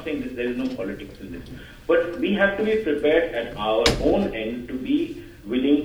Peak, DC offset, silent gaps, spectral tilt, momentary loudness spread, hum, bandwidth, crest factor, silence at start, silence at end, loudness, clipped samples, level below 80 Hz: -2 dBFS; under 0.1%; none; -5 dB/octave; 17 LU; none; 19.5 kHz; 22 dB; 0 s; 0 s; -23 LUFS; under 0.1%; -42 dBFS